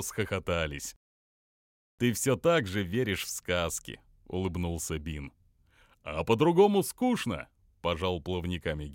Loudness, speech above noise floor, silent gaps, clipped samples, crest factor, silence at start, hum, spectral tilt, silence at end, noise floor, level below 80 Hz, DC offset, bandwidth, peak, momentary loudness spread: -30 LUFS; 34 dB; 0.96-1.98 s; under 0.1%; 20 dB; 0 s; none; -5 dB/octave; 0 s; -64 dBFS; -50 dBFS; under 0.1%; 17 kHz; -12 dBFS; 15 LU